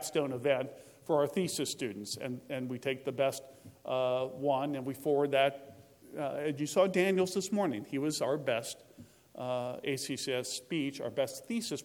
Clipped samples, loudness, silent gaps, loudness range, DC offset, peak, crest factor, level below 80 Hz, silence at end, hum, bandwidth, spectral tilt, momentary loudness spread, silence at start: under 0.1%; -33 LUFS; none; 4 LU; under 0.1%; -14 dBFS; 20 dB; -78 dBFS; 0 s; none; 19 kHz; -4.5 dB/octave; 10 LU; 0 s